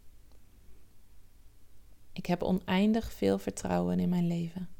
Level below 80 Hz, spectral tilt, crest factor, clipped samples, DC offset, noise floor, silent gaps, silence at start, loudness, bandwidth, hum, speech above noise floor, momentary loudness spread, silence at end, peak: -54 dBFS; -7 dB/octave; 18 dB; under 0.1%; under 0.1%; -53 dBFS; none; 0.05 s; -31 LUFS; 17 kHz; none; 23 dB; 7 LU; 0.05 s; -14 dBFS